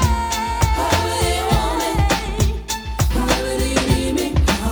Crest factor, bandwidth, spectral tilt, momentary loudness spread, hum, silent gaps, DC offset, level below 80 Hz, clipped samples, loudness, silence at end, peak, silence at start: 16 dB; over 20 kHz; -4.5 dB/octave; 3 LU; none; none; under 0.1%; -24 dBFS; under 0.1%; -19 LUFS; 0 s; -2 dBFS; 0 s